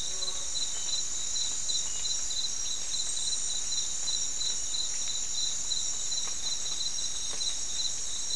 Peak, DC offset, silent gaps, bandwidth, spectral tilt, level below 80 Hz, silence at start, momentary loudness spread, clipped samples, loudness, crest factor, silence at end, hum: -16 dBFS; 2%; none; 12 kHz; 1.5 dB/octave; -54 dBFS; 0 s; 2 LU; under 0.1%; -30 LUFS; 14 dB; 0 s; none